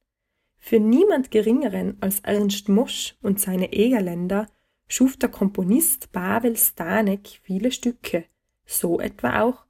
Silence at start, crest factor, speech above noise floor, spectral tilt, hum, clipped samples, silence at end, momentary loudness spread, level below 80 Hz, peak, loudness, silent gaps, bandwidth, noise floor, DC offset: 0.65 s; 18 dB; 56 dB; -4.5 dB/octave; none; under 0.1%; 0.15 s; 8 LU; -54 dBFS; -4 dBFS; -22 LUFS; none; 16.5 kHz; -77 dBFS; under 0.1%